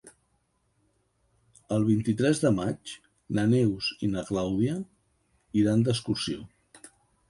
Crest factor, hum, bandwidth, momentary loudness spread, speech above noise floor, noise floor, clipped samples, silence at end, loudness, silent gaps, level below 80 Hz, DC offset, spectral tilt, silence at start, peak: 18 dB; none; 11.5 kHz; 13 LU; 46 dB; -72 dBFS; under 0.1%; 0.4 s; -27 LUFS; none; -56 dBFS; under 0.1%; -6.5 dB/octave; 0.05 s; -10 dBFS